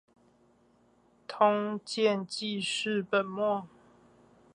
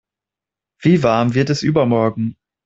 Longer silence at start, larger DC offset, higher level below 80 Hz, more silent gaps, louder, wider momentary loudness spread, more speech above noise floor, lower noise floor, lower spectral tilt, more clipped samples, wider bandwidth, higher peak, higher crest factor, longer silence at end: first, 1.3 s vs 0.8 s; neither; second, -78 dBFS vs -52 dBFS; neither; second, -30 LUFS vs -17 LUFS; about the same, 9 LU vs 7 LU; second, 36 dB vs 72 dB; second, -65 dBFS vs -87 dBFS; second, -4 dB/octave vs -7 dB/octave; neither; first, 11.5 kHz vs 8 kHz; second, -10 dBFS vs -2 dBFS; first, 22 dB vs 16 dB; first, 0.9 s vs 0.35 s